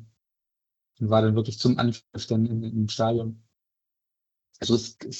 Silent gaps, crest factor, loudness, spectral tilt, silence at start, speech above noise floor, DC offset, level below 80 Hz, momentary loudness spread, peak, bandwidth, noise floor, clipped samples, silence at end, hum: none; 20 dB; -25 LUFS; -6.5 dB/octave; 0 s; 61 dB; under 0.1%; -60 dBFS; 10 LU; -8 dBFS; 8.2 kHz; -85 dBFS; under 0.1%; 0 s; none